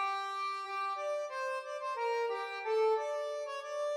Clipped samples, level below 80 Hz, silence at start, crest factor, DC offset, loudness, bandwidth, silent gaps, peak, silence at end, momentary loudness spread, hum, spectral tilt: under 0.1%; under -90 dBFS; 0 s; 14 dB; under 0.1%; -36 LUFS; 13.5 kHz; none; -22 dBFS; 0 s; 7 LU; none; 1 dB/octave